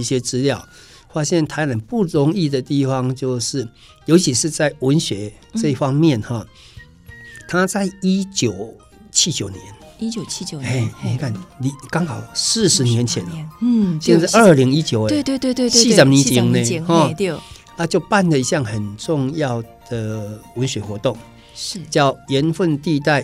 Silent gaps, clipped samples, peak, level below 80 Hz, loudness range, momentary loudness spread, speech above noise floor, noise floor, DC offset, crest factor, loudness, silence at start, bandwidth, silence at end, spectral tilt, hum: none; under 0.1%; 0 dBFS; -50 dBFS; 8 LU; 14 LU; 23 dB; -41 dBFS; under 0.1%; 18 dB; -18 LUFS; 0 s; 15.5 kHz; 0 s; -4.5 dB/octave; none